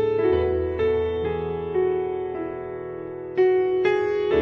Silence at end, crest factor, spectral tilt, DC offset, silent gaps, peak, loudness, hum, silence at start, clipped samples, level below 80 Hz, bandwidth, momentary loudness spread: 0 s; 14 dB; -8.5 dB/octave; under 0.1%; none; -8 dBFS; -24 LUFS; none; 0 s; under 0.1%; -44 dBFS; 6 kHz; 12 LU